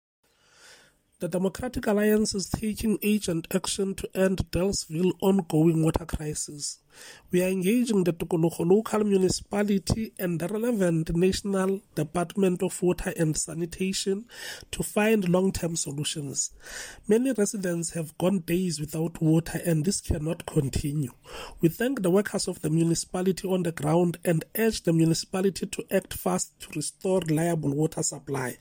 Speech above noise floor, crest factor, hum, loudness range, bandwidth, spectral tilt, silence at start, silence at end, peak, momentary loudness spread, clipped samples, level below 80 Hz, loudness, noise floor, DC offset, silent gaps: 31 dB; 18 dB; none; 2 LU; 17 kHz; -5.5 dB/octave; 1.2 s; 0.05 s; -10 dBFS; 8 LU; under 0.1%; -46 dBFS; -27 LUFS; -58 dBFS; under 0.1%; none